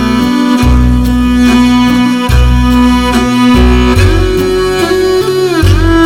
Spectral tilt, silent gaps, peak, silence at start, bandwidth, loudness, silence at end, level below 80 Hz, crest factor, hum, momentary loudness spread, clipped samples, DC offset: -6 dB/octave; none; 0 dBFS; 0 s; 16.5 kHz; -8 LUFS; 0 s; -14 dBFS; 8 dB; none; 3 LU; 1%; 0.8%